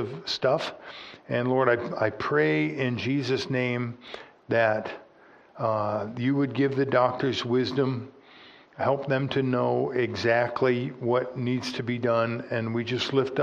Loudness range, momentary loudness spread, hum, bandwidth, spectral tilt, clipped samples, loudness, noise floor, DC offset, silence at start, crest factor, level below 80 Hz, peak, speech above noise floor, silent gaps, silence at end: 2 LU; 8 LU; none; 9.4 kHz; -6.5 dB/octave; under 0.1%; -26 LUFS; -55 dBFS; under 0.1%; 0 s; 20 dB; -68 dBFS; -6 dBFS; 29 dB; none; 0 s